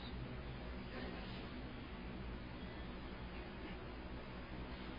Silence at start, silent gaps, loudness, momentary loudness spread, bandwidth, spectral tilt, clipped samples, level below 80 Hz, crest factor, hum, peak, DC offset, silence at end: 0 s; none; -50 LUFS; 2 LU; 5.4 kHz; -5 dB/octave; under 0.1%; -52 dBFS; 14 dB; none; -36 dBFS; under 0.1%; 0 s